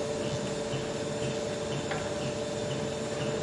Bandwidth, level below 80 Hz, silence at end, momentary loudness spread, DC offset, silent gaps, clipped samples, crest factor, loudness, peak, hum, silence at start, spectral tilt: 11.5 kHz; -56 dBFS; 0 s; 1 LU; under 0.1%; none; under 0.1%; 14 dB; -33 LUFS; -20 dBFS; none; 0 s; -4.5 dB/octave